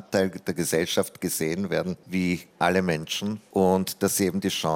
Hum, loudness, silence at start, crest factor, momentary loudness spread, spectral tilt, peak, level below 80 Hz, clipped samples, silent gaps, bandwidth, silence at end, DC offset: none; -26 LUFS; 0 s; 18 dB; 6 LU; -4.5 dB/octave; -8 dBFS; -62 dBFS; under 0.1%; none; 17 kHz; 0 s; under 0.1%